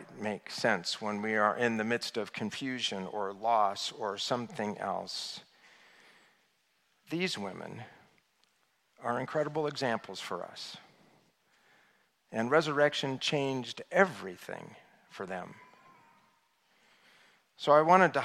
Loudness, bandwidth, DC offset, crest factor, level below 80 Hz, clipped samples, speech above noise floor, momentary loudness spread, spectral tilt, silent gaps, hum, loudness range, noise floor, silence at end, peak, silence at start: -32 LUFS; 14 kHz; under 0.1%; 26 dB; -82 dBFS; under 0.1%; 42 dB; 16 LU; -4.5 dB/octave; none; none; 10 LU; -74 dBFS; 0 s; -8 dBFS; 0 s